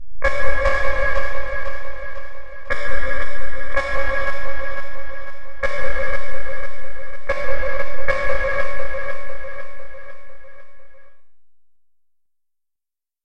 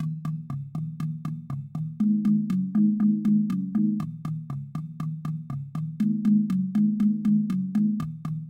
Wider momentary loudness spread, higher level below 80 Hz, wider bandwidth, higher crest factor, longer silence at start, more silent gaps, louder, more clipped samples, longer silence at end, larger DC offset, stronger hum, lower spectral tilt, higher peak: first, 16 LU vs 12 LU; first, -32 dBFS vs -62 dBFS; first, 9 kHz vs 4.8 kHz; about the same, 10 dB vs 14 dB; about the same, 0 s vs 0 s; neither; about the same, -25 LUFS vs -26 LUFS; neither; about the same, 0 s vs 0 s; neither; neither; second, -5 dB/octave vs -9.5 dB/octave; first, 0 dBFS vs -12 dBFS